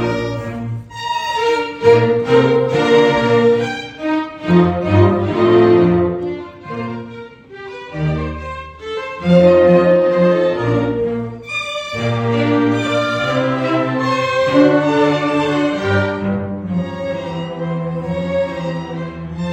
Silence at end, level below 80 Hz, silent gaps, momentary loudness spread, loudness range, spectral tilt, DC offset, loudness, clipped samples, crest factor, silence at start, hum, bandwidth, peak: 0 s; -44 dBFS; none; 14 LU; 6 LU; -7 dB/octave; under 0.1%; -16 LUFS; under 0.1%; 16 dB; 0 s; none; 9 kHz; 0 dBFS